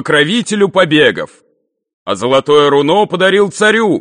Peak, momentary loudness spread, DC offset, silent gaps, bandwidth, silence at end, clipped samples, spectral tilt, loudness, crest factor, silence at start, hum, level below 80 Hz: 0 dBFS; 12 LU; under 0.1%; 1.93-2.06 s; 10 kHz; 0 s; under 0.1%; -4.5 dB/octave; -11 LUFS; 12 dB; 0 s; none; -54 dBFS